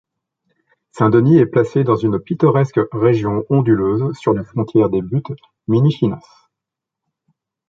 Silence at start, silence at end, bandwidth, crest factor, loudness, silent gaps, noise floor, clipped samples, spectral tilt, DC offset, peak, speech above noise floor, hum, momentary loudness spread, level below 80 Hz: 0.95 s; 1.5 s; 7.6 kHz; 16 dB; -16 LUFS; none; -83 dBFS; under 0.1%; -9.5 dB/octave; under 0.1%; 0 dBFS; 68 dB; none; 8 LU; -50 dBFS